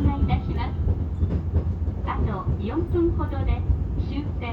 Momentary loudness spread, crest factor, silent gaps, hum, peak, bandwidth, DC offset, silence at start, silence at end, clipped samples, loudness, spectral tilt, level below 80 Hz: 5 LU; 14 dB; none; none; -10 dBFS; 4.8 kHz; under 0.1%; 0 s; 0 s; under 0.1%; -26 LUFS; -10 dB/octave; -28 dBFS